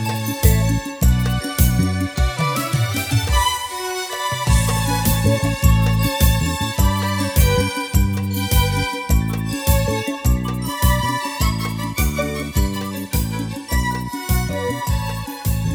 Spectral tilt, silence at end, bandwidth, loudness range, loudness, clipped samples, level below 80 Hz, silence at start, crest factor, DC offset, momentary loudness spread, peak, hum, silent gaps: -5 dB/octave; 0 s; over 20 kHz; 4 LU; -19 LUFS; under 0.1%; -24 dBFS; 0 s; 18 dB; under 0.1%; 7 LU; 0 dBFS; none; none